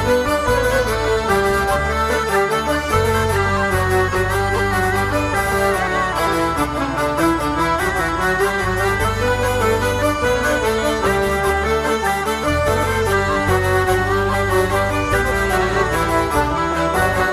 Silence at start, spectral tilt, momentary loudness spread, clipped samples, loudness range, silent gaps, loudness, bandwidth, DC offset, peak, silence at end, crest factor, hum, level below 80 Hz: 0 s; -5 dB/octave; 2 LU; under 0.1%; 1 LU; none; -17 LUFS; 16 kHz; under 0.1%; -2 dBFS; 0 s; 14 dB; none; -30 dBFS